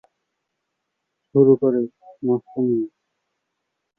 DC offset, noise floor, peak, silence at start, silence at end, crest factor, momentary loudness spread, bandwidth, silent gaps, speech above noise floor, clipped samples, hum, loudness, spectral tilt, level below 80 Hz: under 0.1%; -78 dBFS; -4 dBFS; 1.35 s; 1.1 s; 20 dB; 14 LU; 1.8 kHz; none; 60 dB; under 0.1%; none; -20 LUFS; -13.5 dB/octave; -68 dBFS